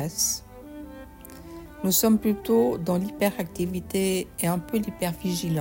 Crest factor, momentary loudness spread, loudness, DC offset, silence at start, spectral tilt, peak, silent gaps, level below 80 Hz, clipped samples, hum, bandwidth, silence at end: 16 dB; 21 LU; -25 LUFS; under 0.1%; 0 s; -4.5 dB/octave; -10 dBFS; none; -50 dBFS; under 0.1%; none; 16.5 kHz; 0 s